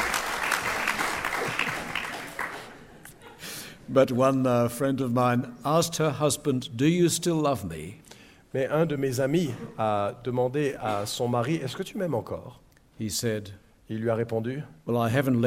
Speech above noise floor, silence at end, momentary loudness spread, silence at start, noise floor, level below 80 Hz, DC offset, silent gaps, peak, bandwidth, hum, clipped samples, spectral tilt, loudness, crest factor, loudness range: 26 dB; 0 s; 14 LU; 0 s; -51 dBFS; -58 dBFS; under 0.1%; none; -8 dBFS; 16.5 kHz; none; under 0.1%; -5 dB/octave; -27 LUFS; 20 dB; 6 LU